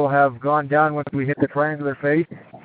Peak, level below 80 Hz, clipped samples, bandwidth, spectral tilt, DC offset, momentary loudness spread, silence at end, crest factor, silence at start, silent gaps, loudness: -4 dBFS; -64 dBFS; under 0.1%; 4.6 kHz; -7 dB/octave; under 0.1%; 6 LU; 0.05 s; 16 dB; 0 s; none; -21 LUFS